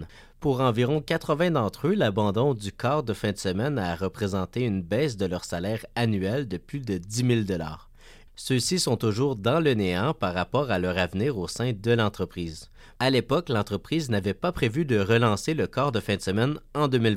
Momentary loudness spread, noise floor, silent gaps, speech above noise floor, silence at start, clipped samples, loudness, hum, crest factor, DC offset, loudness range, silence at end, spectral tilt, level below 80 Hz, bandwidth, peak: 7 LU; -50 dBFS; none; 24 dB; 0 s; under 0.1%; -26 LUFS; none; 16 dB; under 0.1%; 3 LU; 0 s; -5.5 dB/octave; -50 dBFS; 16 kHz; -10 dBFS